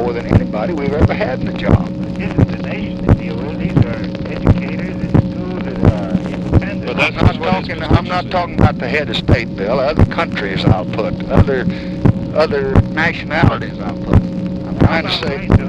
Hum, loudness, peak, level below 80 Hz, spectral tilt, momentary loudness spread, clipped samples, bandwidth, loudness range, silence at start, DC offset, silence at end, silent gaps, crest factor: none; -16 LUFS; 0 dBFS; -26 dBFS; -8 dB/octave; 7 LU; under 0.1%; 8 kHz; 2 LU; 0 s; under 0.1%; 0 s; none; 14 dB